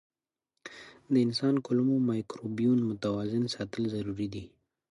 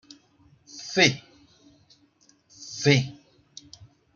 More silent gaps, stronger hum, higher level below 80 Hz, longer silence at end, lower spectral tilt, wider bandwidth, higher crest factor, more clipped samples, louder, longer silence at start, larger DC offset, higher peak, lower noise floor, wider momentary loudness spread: neither; neither; about the same, -64 dBFS vs -66 dBFS; second, 0.45 s vs 1.05 s; first, -7 dB/octave vs -4 dB/octave; first, 11.5 kHz vs 7.4 kHz; second, 16 dB vs 24 dB; neither; second, -30 LUFS vs -23 LUFS; about the same, 0.65 s vs 0.75 s; neither; second, -14 dBFS vs -6 dBFS; first, -86 dBFS vs -62 dBFS; second, 19 LU vs 25 LU